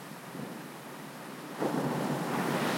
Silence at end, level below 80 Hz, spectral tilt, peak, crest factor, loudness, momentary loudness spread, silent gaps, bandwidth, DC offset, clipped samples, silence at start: 0 s; -78 dBFS; -5 dB/octave; -18 dBFS; 18 dB; -35 LUFS; 12 LU; none; 16.5 kHz; under 0.1%; under 0.1%; 0 s